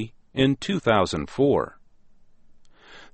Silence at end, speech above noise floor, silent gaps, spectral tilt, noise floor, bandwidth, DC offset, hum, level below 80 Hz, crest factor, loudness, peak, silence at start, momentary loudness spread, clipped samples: 0.1 s; 29 dB; none; -6 dB/octave; -51 dBFS; 8.6 kHz; under 0.1%; none; -50 dBFS; 20 dB; -23 LUFS; -6 dBFS; 0 s; 7 LU; under 0.1%